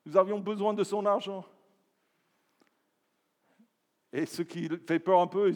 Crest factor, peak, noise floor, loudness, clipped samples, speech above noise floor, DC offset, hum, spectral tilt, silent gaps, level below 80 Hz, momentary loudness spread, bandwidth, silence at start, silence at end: 22 dB; -10 dBFS; -77 dBFS; -30 LUFS; under 0.1%; 49 dB; under 0.1%; none; -6 dB/octave; none; under -90 dBFS; 12 LU; 18.5 kHz; 0.05 s; 0 s